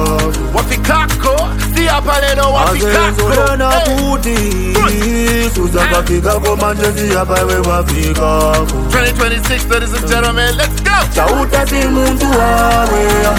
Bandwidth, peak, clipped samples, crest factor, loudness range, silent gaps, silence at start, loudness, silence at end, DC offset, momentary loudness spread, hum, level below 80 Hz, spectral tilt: 17.5 kHz; 0 dBFS; under 0.1%; 12 dB; 1 LU; none; 0 s; -12 LUFS; 0 s; under 0.1%; 3 LU; none; -18 dBFS; -4.5 dB/octave